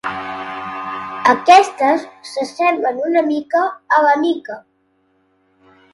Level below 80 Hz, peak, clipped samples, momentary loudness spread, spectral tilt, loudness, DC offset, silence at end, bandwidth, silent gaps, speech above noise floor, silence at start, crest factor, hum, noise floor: -64 dBFS; 0 dBFS; under 0.1%; 16 LU; -3.5 dB/octave; -16 LUFS; under 0.1%; 1.35 s; 11.5 kHz; none; 46 dB; 0.05 s; 18 dB; none; -61 dBFS